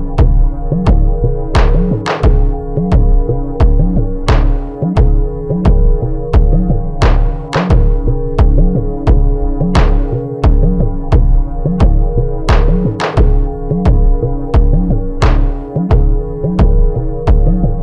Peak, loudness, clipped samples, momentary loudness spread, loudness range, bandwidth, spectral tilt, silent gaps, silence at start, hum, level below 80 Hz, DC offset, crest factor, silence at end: 0 dBFS; -14 LUFS; under 0.1%; 5 LU; 1 LU; 6.6 kHz; -8 dB/octave; none; 0 s; none; -12 dBFS; under 0.1%; 10 dB; 0 s